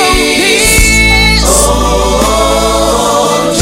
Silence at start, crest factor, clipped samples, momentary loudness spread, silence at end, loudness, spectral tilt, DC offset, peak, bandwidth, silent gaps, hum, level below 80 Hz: 0 s; 8 dB; 0.4%; 4 LU; 0 s; -7 LUFS; -3 dB/octave; under 0.1%; 0 dBFS; 16.5 kHz; none; none; -16 dBFS